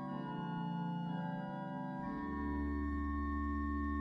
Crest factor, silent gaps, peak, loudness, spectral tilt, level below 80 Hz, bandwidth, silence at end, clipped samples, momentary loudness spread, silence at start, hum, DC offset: 12 dB; none; -28 dBFS; -40 LUFS; -9 dB/octave; -46 dBFS; 5.8 kHz; 0 s; under 0.1%; 4 LU; 0 s; none; under 0.1%